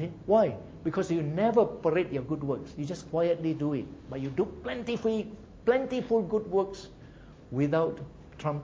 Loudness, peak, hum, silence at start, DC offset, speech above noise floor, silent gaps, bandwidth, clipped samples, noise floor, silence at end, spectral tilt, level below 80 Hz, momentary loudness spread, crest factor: -30 LUFS; -12 dBFS; none; 0 s; under 0.1%; 21 dB; none; 7.8 kHz; under 0.1%; -50 dBFS; 0 s; -7.5 dB/octave; -56 dBFS; 12 LU; 18 dB